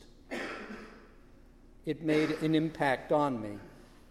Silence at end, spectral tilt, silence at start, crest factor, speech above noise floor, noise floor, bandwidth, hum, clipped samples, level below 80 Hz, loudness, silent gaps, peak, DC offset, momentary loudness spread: 0.25 s; -6.5 dB/octave; 0 s; 20 dB; 26 dB; -56 dBFS; 13 kHz; none; under 0.1%; -58 dBFS; -32 LUFS; none; -14 dBFS; under 0.1%; 17 LU